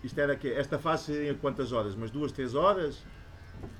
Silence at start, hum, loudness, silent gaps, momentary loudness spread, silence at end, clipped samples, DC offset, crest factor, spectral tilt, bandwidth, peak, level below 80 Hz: 0 s; none; -31 LUFS; none; 20 LU; 0 s; under 0.1%; under 0.1%; 18 dB; -6.5 dB/octave; 13.5 kHz; -12 dBFS; -52 dBFS